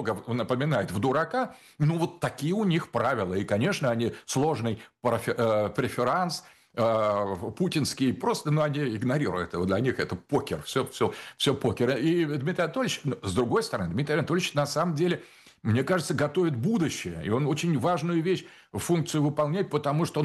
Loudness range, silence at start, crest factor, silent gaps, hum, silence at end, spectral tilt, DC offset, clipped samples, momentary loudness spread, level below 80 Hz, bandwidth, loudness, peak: 1 LU; 0 s; 14 dB; none; none; 0 s; -6 dB/octave; under 0.1%; under 0.1%; 5 LU; -60 dBFS; 12.5 kHz; -27 LUFS; -12 dBFS